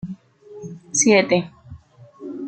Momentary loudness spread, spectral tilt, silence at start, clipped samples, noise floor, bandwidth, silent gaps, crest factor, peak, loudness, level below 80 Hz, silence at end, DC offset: 24 LU; -3.5 dB/octave; 0.05 s; under 0.1%; -44 dBFS; 9.4 kHz; none; 20 dB; -2 dBFS; -17 LUFS; -58 dBFS; 0 s; under 0.1%